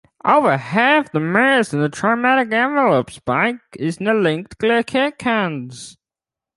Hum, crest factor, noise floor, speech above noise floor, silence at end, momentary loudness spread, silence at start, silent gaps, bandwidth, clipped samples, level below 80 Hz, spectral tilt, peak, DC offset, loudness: none; 16 dB; -89 dBFS; 71 dB; 0.65 s; 10 LU; 0.25 s; none; 11.5 kHz; under 0.1%; -58 dBFS; -5.5 dB/octave; -2 dBFS; under 0.1%; -17 LUFS